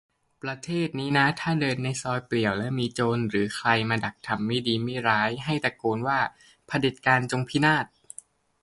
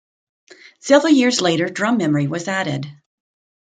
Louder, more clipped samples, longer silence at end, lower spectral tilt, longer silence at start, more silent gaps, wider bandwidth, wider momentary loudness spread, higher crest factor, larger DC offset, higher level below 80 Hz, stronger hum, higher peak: second, -26 LUFS vs -17 LUFS; neither; about the same, 0.75 s vs 0.7 s; about the same, -5.5 dB/octave vs -4.5 dB/octave; second, 0.45 s vs 0.85 s; neither; first, 11.5 kHz vs 9.6 kHz; second, 8 LU vs 14 LU; about the same, 22 dB vs 18 dB; neither; about the same, -60 dBFS vs -64 dBFS; neither; about the same, -4 dBFS vs -2 dBFS